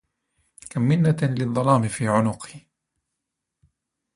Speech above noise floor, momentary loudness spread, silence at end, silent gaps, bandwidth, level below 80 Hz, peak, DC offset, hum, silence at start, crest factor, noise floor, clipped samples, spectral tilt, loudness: 61 dB; 13 LU; 1.55 s; none; 11.5 kHz; -58 dBFS; -4 dBFS; under 0.1%; none; 0.65 s; 20 dB; -82 dBFS; under 0.1%; -7 dB/octave; -22 LUFS